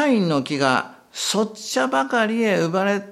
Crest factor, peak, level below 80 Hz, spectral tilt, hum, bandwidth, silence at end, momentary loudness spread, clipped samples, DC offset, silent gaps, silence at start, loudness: 18 dB; -2 dBFS; -68 dBFS; -4.5 dB/octave; none; 15 kHz; 0 s; 4 LU; under 0.1%; under 0.1%; none; 0 s; -21 LUFS